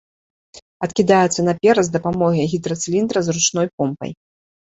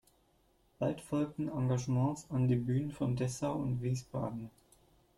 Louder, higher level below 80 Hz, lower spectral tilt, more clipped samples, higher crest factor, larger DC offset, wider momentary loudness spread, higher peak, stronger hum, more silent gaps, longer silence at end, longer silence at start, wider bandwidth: first, -18 LUFS vs -35 LUFS; first, -54 dBFS vs -62 dBFS; second, -4.5 dB/octave vs -7.5 dB/octave; neither; about the same, 18 dB vs 14 dB; neither; about the same, 9 LU vs 7 LU; first, -2 dBFS vs -20 dBFS; neither; first, 0.62-0.80 s, 3.73-3.78 s vs none; about the same, 0.6 s vs 0.7 s; second, 0.55 s vs 0.8 s; second, 8 kHz vs 12 kHz